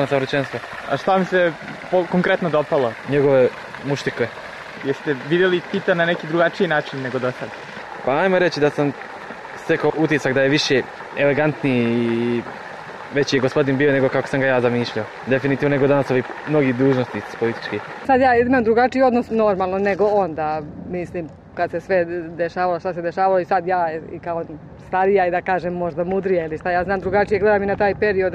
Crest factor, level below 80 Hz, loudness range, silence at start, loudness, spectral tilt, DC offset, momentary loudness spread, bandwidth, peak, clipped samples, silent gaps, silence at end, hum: 14 dB; -52 dBFS; 3 LU; 0 s; -20 LUFS; -6.5 dB/octave; under 0.1%; 11 LU; 11 kHz; -6 dBFS; under 0.1%; none; 0 s; none